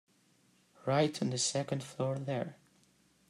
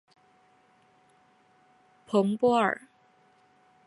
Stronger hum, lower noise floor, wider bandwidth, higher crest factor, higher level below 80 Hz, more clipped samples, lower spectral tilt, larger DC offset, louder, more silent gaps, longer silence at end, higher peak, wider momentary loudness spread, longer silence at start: neither; first, -69 dBFS vs -63 dBFS; first, 13 kHz vs 11.5 kHz; about the same, 20 dB vs 20 dB; about the same, -76 dBFS vs -76 dBFS; neither; second, -4.5 dB/octave vs -6.5 dB/octave; neither; second, -34 LUFS vs -26 LUFS; neither; second, 0.75 s vs 1.15 s; second, -16 dBFS vs -10 dBFS; about the same, 8 LU vs 6 LU; second, 0.85 s vs 2.1 s